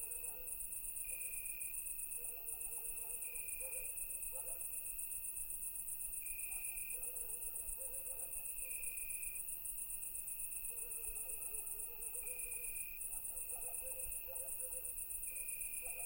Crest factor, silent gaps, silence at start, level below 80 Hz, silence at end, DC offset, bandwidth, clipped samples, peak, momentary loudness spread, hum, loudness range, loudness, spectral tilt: 16 dB; none; 0 s; -62 dBFS; 0 s; under 0.1%; 16.5 kHz; under 0.1%; -30 dBFS; 1 LU; none; 0 LU; -42 LUFS; 0 dB/octave